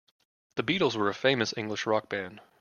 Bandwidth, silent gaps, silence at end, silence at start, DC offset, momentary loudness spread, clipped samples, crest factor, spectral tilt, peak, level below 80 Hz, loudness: 7.2 kHz; none; 0.2 s; 0.55 s; under 0.1%; 10 LU; under 0.1%; 22 dB; -4.5 dB/octave; -8 dBFS; -68 dBFS; -29 LUFS